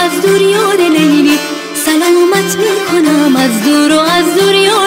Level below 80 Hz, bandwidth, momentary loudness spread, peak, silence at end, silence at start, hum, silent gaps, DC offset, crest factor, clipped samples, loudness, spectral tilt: -52 dBFS; 16 kHz; 4 LU; 0 dBFS; 0 s; 0 s; none; none; under 0.1%; 10 dB; under 0.1%; -9 LUFS; -3.5 dB/octave